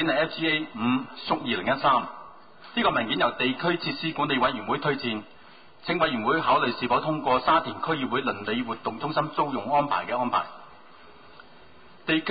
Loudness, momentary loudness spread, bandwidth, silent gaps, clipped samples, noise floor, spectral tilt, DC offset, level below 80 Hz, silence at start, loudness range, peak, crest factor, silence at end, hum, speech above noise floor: -26 LUFS; 7 LU; 5 kHz; none; under 0.1%; -52 dBFS; -9.5 dB/octave; 0.3%; -60 dBFS; 0 s; 3 LU; -10 dBFS; 16 dB; 0 s; none; 27 dB